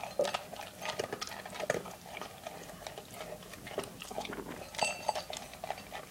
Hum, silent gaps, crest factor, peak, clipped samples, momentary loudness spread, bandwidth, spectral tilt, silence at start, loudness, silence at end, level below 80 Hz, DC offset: none; none; 26 dB; -14 dBFS; under 0.1%; 11 LU; 17 kHz; -2.5 dB/octave; 0 s; -40 LUFS; 0 s; -64 dBFS; under 0.1%